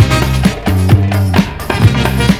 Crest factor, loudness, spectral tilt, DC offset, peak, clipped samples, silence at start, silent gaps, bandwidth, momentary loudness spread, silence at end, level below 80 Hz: 10 dB; -12 LUFS; -6 dB/octave; under 0.1%; 0 dBFS; 0.9%; 0 s; none; 16 kHz; 3 LU; 0 s; -22 dBFS